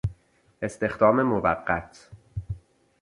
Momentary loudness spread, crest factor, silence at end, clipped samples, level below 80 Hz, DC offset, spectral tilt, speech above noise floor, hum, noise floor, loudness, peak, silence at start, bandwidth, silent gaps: 19 LU; 22 dB; 0.45 s; under 0.1%; -46 dBFS; under 0.1%; -7.5 dB/octave; 30 dB; none; -54 dBFS; -25 LUFS; -6 dBFS; 0.05 s; 11.5 kHz; none